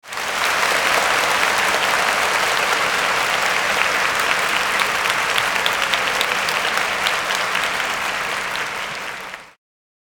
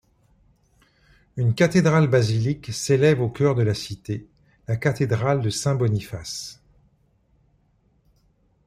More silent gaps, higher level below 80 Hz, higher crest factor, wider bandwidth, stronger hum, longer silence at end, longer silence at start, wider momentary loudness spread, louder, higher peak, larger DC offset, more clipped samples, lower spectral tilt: neither; about the same, -52 dBFS vs -54 dBFS; about the same, 18 dB vs 18 dB; first, 19 kHz vs 14.5 kHz; neither; second, 0.55 s vs 2.15 s; second, 0.05 s vs 1.35 s; second, 7 LU vs 14 LU; first, -18 LUFS vs -22 LUFS; first, 0 dBFS vs -4 dBFS; neither; neither; second, -0.5 dB/octave vs -6 dB/octave